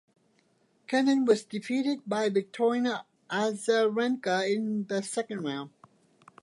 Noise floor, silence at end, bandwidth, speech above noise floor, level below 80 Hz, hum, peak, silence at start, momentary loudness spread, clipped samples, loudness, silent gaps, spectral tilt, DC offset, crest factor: -68 dBFS; 0.75 s; 11.5 kHz; 40 dB; -82 dBFS; none; -10 dBFS; 0.9 s; 9 LU; under 0.1%; -29 LUFS; none; -4.5 dB/octave; under 0.1%; 18 dB